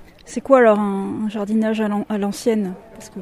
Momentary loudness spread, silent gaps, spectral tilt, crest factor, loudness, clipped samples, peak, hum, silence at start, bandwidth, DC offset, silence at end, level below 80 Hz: 17 LU; none; -6.5 dB/octave; 20 dB; -19 LUFS; under 0.1%; 0 dBFS; none; 0 s; 13.5 kHz; under 0.1%; 0 s; -54 dBFS